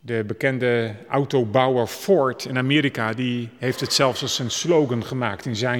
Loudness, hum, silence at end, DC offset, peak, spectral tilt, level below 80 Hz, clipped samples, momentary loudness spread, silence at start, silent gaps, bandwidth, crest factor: -22 LUFS; none; 0 s; under 0.1%; -4 dBFS; -4.5 dB/octave; -64 dBFS; under 0.1%; 7 LU; 0.05 s; none; 19 kHz; 18 dB